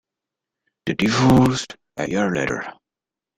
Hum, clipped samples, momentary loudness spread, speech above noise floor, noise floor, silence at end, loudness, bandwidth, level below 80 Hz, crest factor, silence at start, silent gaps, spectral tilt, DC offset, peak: none; under 0.1%; 16 LU; 69 dB; -88 dBFS; 0.65 s; -20 LUFS; 15.5 kHz; -46 dBFS; 18 dB; 0.85 s; none; -5.5 dB/octave; under 0.1%; -4 dBFS